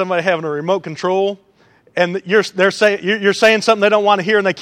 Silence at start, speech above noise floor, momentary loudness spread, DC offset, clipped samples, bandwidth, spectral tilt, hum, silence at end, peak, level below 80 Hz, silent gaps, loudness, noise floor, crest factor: 0 s; 37 dB; 7 LU; under 0.1%; under 0.1%; 13 kHz; -4.5 dB/octave; none; 0 s; 0 dBFS; -68 dBFS; none; -15 LUFS; -52 dBFS; 16 dB